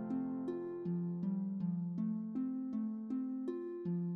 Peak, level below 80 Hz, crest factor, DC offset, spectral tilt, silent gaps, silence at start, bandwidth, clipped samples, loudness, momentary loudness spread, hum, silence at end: -28 dBFS; -80 dBFS; 10 dB; under 0.1%; -11.5 dB/octave; none; 0 s; 4.1 kHz; under 0.1%; -40 LUFS; 3 LU; none; 0 s